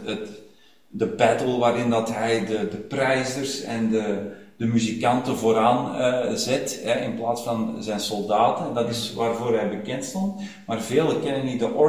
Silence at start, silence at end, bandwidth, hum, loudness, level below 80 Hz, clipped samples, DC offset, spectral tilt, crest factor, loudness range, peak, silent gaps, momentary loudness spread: 0 s; 0 s; 16 kHz; none; -24 LUFS; -60 dBFS; under 0.1%; 0.2%; -5 dB/octave; 20 dB; 2 LU; -4 dBFS; none; 8 LU